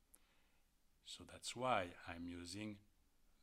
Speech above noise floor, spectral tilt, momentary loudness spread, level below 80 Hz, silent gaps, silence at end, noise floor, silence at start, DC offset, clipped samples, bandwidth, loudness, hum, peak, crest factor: 29 dB; -3.5 dB/octave; 15 LU; -76 dBFS; none; 0.6 s; -75 dBFS; 0.15 s; under 0.1%; under 0.1%; 16 kHz; -47 LUFS; none; -24 dBFS; 26 dB